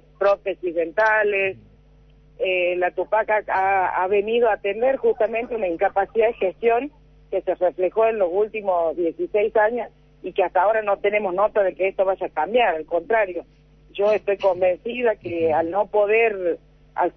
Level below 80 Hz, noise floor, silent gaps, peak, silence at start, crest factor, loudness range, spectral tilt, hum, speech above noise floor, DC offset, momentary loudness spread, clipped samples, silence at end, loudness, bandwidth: -54 dBFS; -52 dBFS; none; -8 dBFS; 0.2 s; 14 dB; 1 LU; -6.5 dB/octave; none; 31 dB; under 0.1%; 7 LU; under 0.1%; 0.05 s; -21 LUFS; 6.2 kHz